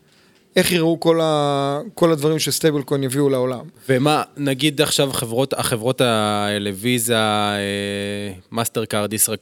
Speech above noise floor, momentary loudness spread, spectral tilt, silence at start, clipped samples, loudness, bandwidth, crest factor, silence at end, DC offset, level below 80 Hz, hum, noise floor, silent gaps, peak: 35 dB; 6 LU; -4 dB/octave; 0.55 s; under 0.1%; -19 LUFS; 18.5 kHz; 20 dB; 0.05 s; under 0.1%; -56 dBFS; none; -54 dBFS; none; 0 dBFS